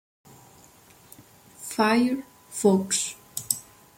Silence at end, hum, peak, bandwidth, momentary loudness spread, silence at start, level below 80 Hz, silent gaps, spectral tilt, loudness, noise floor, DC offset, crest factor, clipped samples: 0.35 s; none; -4 dBFS; 17 kHz; 14 LU; 1.6 s; -66 dBFS; none; -4 dB/octave; -25 LUFS; -54 dBFS; under 0.1%; 24 dB; under 0.1%